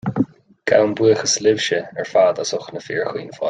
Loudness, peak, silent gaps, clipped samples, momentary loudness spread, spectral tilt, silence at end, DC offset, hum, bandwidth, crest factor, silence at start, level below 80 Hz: -19 LUFS; -2 dBFS; none; under 0.1%; 10 LU; -3.5 dB/octave; 0 s; under 0.1%; none; 9.4 kHz; 16 dB; 0.05 s; -60 dBFS